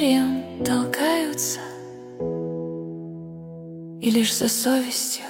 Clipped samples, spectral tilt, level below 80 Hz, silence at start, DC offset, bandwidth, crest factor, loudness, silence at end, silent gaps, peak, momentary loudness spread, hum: under 0.1%; -3.5 dB/octave; -60 dBFS; 0 s; under 0.1%; 17.5 kHz; 16 dB; -23 LUFS; 0 s; none; -8 dBFS; 18 LU; none